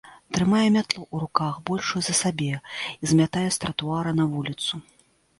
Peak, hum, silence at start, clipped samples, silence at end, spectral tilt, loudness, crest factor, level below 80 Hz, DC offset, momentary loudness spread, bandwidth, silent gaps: -2 dBFS; none; 0.05 s; under 0.1%; 0.6 s; -4.5 dB/octave; -24 LUFS; 24 dB; -56 dBFS; under 0.1%; 9 LU; 11.5 kHz; none